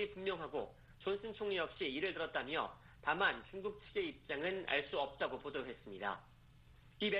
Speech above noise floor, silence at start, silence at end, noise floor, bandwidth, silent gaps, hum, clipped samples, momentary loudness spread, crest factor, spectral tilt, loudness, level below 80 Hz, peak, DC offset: 22 dB; 0 s; 0 s; -63 dBFS; 5.6 kHz; none; none; under 0.1%; 10 LU; 22 dB; -6 dB/octave; -41 LUFS; -66 dBFS; -20 dBFS; under 0.1%